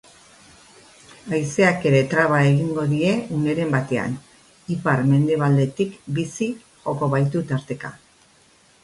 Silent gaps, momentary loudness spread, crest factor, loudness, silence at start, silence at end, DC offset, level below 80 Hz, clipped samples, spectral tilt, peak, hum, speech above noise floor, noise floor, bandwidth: none; 13 LU; 18 dB; -21 LUFS; 1.25 s; 0.85 s; under 0.1%; -58 dBFS; under 0.1%; -7 dB/octave; -4 dBFS; none; 35 dB; -55 dBFS; 11.5 kHz